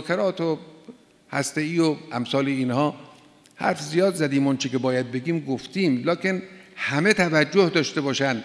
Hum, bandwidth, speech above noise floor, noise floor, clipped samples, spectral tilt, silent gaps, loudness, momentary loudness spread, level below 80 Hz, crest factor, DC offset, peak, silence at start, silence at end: none; 11 kHz; 29 dB; -52 dBFS; under 0.1%; -5 dB/octave; none; -23 LUFS; 9 LU; -66 dBFS; 20 dB; under 0.1%; -4 dBFS; 0 s; 0 s